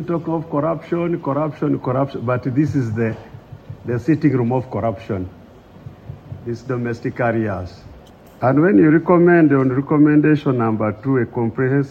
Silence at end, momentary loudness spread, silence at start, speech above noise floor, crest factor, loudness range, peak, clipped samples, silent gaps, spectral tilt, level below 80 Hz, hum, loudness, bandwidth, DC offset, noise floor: 0 s; 16 LU; 0 s; 25 dB; 16 dB; 10 LU; -2 dBFS; under 0.1%; none; -9.5 dB/octave; -52 dBFS; none; -18 LUFS; 7 kHz; under 0.1%; -42 dBFS